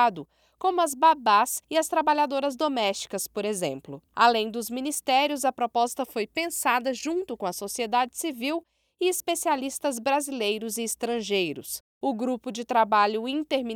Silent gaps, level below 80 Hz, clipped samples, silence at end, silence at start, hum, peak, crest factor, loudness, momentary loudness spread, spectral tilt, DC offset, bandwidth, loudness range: 11.80-12.01 s; -68 dBFS; under 0.1%; 0 s; 0 s; none; -8 dBFS; 20 dB; -26 LUFS; 9 LU; -2.5 dB/octave; under 0.1%; 19.5 kHz; 4 LU